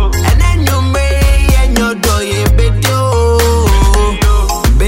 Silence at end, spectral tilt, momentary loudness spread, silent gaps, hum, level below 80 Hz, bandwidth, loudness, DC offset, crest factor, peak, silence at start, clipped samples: 0 s; -5 dB/octave; 2 LU; none; none; -12 dBFS; 16.5 kHz; -11 LUFS; under 0.1%; 10 dB; 0 dBFS; 0 s; under 0.1%